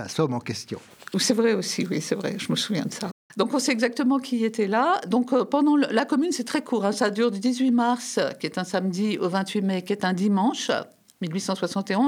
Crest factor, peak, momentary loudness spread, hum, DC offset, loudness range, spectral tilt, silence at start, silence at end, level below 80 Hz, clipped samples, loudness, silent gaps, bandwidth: 16 dB; -8 dBFS; 9 LU; none; under 0.1%; 3 LU; -4.5 dB/octave; 0 s; 0 s; -74 dBFS; under 0.1%; -24 LUFS; 3.12-3.30 s; 16 kHz